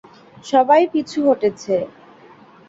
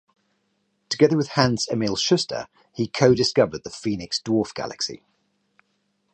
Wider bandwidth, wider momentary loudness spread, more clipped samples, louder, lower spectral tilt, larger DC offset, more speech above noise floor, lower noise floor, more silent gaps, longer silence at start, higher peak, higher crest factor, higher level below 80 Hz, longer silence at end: second, 7.8 kHz vs 9 kHz; about the same, 12 LU vs 11 LU; neither; first, -17 LUFS vs -22 LUFS; about the same, -5.5 dB/octave vs -5 dB/octave; neither; second, 29 dB vs 49 dB; second, -46 dBFS vs -71 dBFS; neither; second, 0.45 s vs 0.9 s; about the same, -2 dBFS vs -2 dBFS; second, 16 dB vs 22 dB; second, -64 dBFS vs -56 dBFS; second, 0.8 s vs 1.15 s